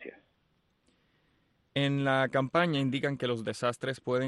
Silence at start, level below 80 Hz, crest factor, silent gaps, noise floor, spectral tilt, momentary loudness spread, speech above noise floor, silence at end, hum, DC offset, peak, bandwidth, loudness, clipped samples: 0 s; -72 dBFS; 18 dB; none; -73 dBFS; -6 dB/octave; 7 LU; 43 dB; 0 s; none; under 0.1%; -14 dBFS; 12 kHz; -30 LUFS; under 0.1%